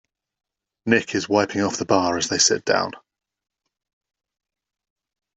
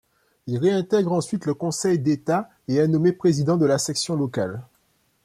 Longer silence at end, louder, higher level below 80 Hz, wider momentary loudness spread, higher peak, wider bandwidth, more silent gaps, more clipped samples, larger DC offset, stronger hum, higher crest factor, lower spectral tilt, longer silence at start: first, 2.4 s vs 0.6 s; about the same, -20 LUFS vs -22 LUFS; about the same, -64 dBFS vs -62 dBFS; about the same, 6 LU vs 8 LU; first, -2 dBFS vs -8 dBFS; second, 8.2 kHz vs 14.5 kHz; neither; neither; neither; neither; first, 22 dB vs 14 dB; second, -2.5 dB/octave vs -6 dB/octave; first, 0.85 s vs 0.45 s